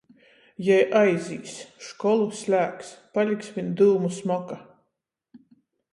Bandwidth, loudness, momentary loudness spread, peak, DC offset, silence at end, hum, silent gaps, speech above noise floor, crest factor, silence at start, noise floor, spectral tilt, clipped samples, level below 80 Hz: 11.5 kHz; -24 LUFS; 19 LU; -6 dBFS; under 0.1%; 0.55 s; none; none; 57 dB; 18 dB; 0.6 s; -80 dBFS; -6 dB/octave; under 0.1%; -72 dBFS